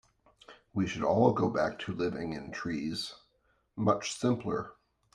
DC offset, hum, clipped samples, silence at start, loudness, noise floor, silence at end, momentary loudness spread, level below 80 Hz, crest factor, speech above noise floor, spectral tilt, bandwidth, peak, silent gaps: under 0.1%; none; under 0.1%; 0.5 s; -32 LUFS; -73 dBFS; 0.4 s; 12 LU; -64 dBFS; 20 dB; 42 dB; -6 dB/octave; 12.5 kHz; -12 dBFS; none